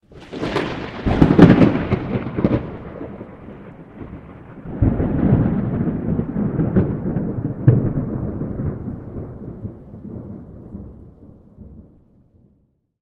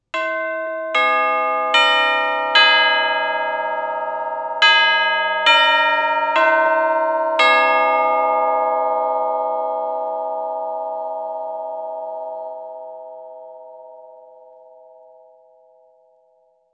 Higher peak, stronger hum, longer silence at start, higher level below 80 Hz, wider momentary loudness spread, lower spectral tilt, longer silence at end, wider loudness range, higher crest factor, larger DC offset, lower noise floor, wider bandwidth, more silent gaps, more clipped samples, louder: about the same, 0 dBFS vs 0 dBFS; neither; about the same, 0.1 s vs 0.15 s; first, -34 dBFS vs -78 dBFS; first, 22 LU vs 16 LU; first, -9.5 dB/octave vs -0.5 dB/octave; second, 1.2 s vs 2.55 s; first, 19 LU vs 16 LU; about the same, 20 dB vs 20 dB; neither; about the same, -62 dBFS vs -59 dBFS; second, 7.4 kHz vs 9 kHz; neither; first, 0.1% vs under 0.1%; about the same, -19 LUFS vs -17 LUFS